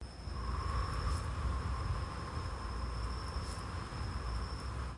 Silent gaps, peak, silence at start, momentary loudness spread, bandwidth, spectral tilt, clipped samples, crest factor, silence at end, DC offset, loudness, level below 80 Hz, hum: none; -24 dBFS; 0 s; 4 LU; 11.5 kHz; -5.5 dB/octave; under 0.1%; 14 dB; 0 s; under 0.1%; -40 LUFS; -42 dBFS; none